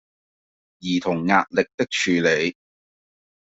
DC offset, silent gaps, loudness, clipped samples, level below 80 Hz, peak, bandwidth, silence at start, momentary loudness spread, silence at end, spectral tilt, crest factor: under 0.1%; 1.74-1.78 s; -21 LUFS; under 0.1%; -62 dBFS; -2 dBFS; 8 kHz; 0.8 s; 7 LU; 1.05 s; -4.5 dB/octave; 22 dB